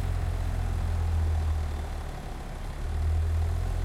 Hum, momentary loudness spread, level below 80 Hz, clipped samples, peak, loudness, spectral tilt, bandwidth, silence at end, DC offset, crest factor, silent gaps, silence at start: none; 10 LU; -32 dBFS; under 0.1%; -18 dBFS; -31 LUFS; -6.5 dB/octave; 12.5 kHz; 0 s; under 0.1%; 10 dB; none; 0 s